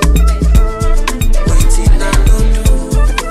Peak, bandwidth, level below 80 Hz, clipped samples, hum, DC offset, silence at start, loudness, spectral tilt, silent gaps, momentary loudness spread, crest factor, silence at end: 0 dBFS; 13.5 kHz; -8 dBFS; under 0.1%; none; under 0.1%; 0 s; -13 LUFS; -5 dB/octave; none; 4 LU; 8 dB; 0 s